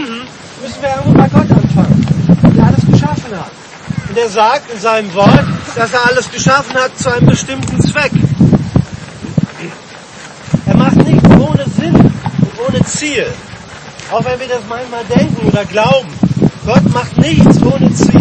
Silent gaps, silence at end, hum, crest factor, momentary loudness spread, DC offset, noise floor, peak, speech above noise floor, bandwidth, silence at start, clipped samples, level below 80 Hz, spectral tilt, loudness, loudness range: none; 0 s; none; 10 dB; 18 LU; under 0.1%; -31 dBFS; 0 dBFS; 21 dB; 8.8 kHz; 0 s; 0.5%; -32 dBFS; -6.5 dB/octave; -11 LUFS; 4 LU